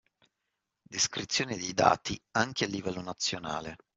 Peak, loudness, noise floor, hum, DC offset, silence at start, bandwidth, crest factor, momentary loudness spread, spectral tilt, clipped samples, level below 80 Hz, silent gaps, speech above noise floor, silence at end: -8 dBFS; -30 LUFS; -84 dBFS; none; under 0.1%; 0.9 s; 8.2 kHz; 26 dB; 11 LU; -2.5 dB/octave; under 0.1%; -62 dBFS; none; 53 dB; 0.2 s